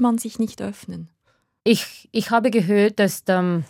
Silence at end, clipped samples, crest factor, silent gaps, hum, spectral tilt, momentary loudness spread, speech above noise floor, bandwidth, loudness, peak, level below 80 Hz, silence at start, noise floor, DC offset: 0.05 s; under 0.1%; 18 dB; none; none; -5.5 dB/octave; 14 LU; 44 dB; 17.5 kHz; -21 LUFS; -4 dBFS; -66 dBFS; 0 s; -65 dBFS; under 0.1%